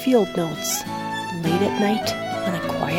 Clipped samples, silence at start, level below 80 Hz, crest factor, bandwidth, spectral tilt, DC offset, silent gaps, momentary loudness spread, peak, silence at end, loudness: under 0.1%; 0 s; -52 dBFS; 16 dB; 16.5 kHz; -4.5 dB/octave; under 0.1%; none; 7 LU; -6 dBFS; 0 s; -23 LUFS